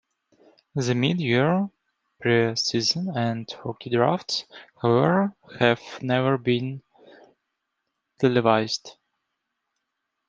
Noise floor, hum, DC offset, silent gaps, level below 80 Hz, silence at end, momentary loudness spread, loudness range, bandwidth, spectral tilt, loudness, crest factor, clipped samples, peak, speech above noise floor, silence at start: -80 dBFS; none; under 0.1%; none; -66 dBFS; 1.4 s; 11 LU; 3 LU; 9.6 kHz; -5.5 dB/octave; -24 LUFS; 22 dB; under 0.1%; -2 dBFS; 57 dB; 0.75 s